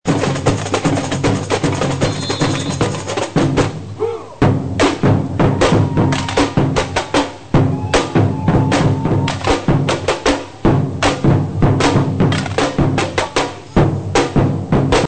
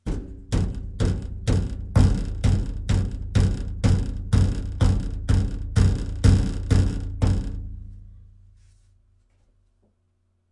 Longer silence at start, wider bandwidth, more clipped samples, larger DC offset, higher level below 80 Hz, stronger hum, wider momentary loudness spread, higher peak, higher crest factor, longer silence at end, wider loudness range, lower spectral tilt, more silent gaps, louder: about the same, 0.05 s vs 0.05 s; second, 9.2 kHz vs 11 kHz; neither; first, 0.8% vs under 0.1%; about the same, -30 dBFS vs -28 dBFS; neither; second, 4 LU vs 9 LU; first, 0 dBFS vs -4 dBFS; about the same, 16 dB vs 20 dB; second, 0 s vs 2.25 s; second, 2 LU vs 6 LU; about the same, -6 dB/octave vs -7 dB/octave; neither; first, -16 LUFS vs -24 LUFS